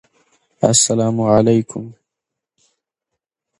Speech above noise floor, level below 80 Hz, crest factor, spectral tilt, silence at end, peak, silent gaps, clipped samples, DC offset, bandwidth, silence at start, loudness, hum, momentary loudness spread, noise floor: 67 dB; -50 dBFS; 18 dB; -4.5 dB/octave; 1.7 s; 0 dBFS; none; under 0.1%; under 0.1%; 11.5 kHz; 0.6 s; -15 LUFS; none; 17 LU; -82 dBFS